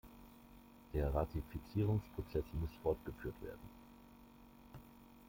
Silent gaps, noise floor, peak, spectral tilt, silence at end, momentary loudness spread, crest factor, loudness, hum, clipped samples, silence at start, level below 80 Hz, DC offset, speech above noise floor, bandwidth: none; -61 dBFS; -24 dBFS; -8.5 dB/octave; 0 s; 23 LU; 18 dB; -42 LUFS; none; under 0.1%; 0.05 s; -50 dBFS; under 0.1%; 21 dB; 16.5 kHz